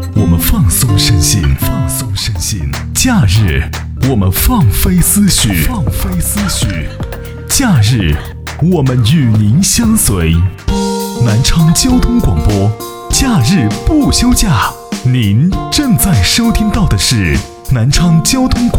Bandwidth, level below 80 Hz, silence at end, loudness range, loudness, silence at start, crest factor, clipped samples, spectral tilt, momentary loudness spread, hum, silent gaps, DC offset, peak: over 20 kHz; -20 dBFS; 0 s; 2 LU; -11 LUFS; 0 s; 10 dB; under 0.1%; -4.5 dB/octave; 7 LU; none; none; under 0.1%; 0 dBFS